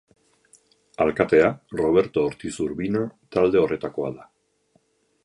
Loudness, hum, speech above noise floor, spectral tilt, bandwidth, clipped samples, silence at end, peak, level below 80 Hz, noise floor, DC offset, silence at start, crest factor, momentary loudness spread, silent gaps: -23 LUFS; none; 44 dB; -6.5 dB/octave; 11 kHz; under 0.1%; 1 s; -4 dBFS; -54 dBFS; -66 dBFS; under 0.1%; 1 s; 20 dB; 11 LU; none